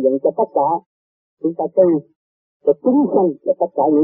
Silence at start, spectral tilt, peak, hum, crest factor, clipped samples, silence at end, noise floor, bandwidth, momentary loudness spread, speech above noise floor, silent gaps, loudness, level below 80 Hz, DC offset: 0 s; -13.5 dB/octave; -2 dBFS; none; 16 dB; under 0.1%; 0 s; under -90 dBFS; 2.2 kHz; 7 LU; over 74 dB; 0.86-1.37 s, 2.16-2.60 s; -18 LUFS; -66 dBFS; under 0.1%